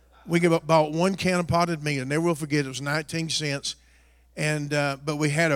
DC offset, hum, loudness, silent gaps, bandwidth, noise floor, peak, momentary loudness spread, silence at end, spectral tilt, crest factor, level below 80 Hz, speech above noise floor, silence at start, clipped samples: under 0.1%; none; -25 LUFS; none; 16 kHz; -57 dBFS; -8 dBFS; 7 LU; 0 s; -5 dB/octave; 18 dB; -56 dBFS; 33 dB; 0.25 s; under 0.1%